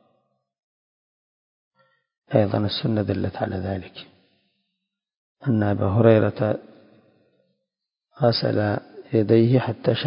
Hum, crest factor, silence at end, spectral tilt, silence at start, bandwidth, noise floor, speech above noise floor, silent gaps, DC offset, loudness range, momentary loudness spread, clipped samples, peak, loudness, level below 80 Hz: none; 22 dB; 0 s; -11.5 dB/octave; 2.3 s; 5.4 kHz; -84 dBFS; 63 dB; 5.17-5.35 s; under 0.1%; 4 LU; 13 LU; under 0.1%; -2 dBFS; -22 LUFS; -50 dBFS